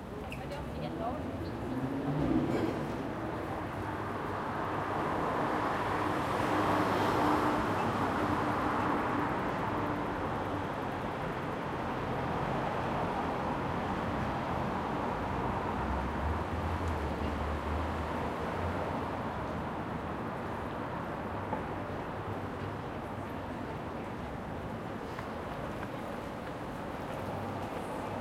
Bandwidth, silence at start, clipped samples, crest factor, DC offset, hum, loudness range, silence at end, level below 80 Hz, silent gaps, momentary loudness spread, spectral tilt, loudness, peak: 16.5 kHz; 0 s; under 0.1%; 18 dB; under 0.1%; none; 9 LU; 0 s; -48 dBFS; none; 9 LU; -7 dB/octave; -35 LUFS; -16 dBFS